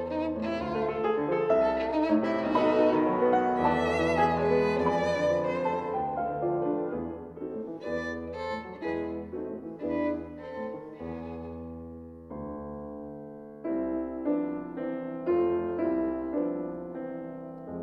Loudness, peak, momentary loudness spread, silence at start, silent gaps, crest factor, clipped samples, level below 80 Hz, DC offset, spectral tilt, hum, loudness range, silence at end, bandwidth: -29 LUFS; -12 dBFS; 15 LU; 0 s; none; 18 dB; under 0.1%; -54 dBFS; under 0.1%; -7 dB/octave; none; 11 LU; 0 s; 9 kHz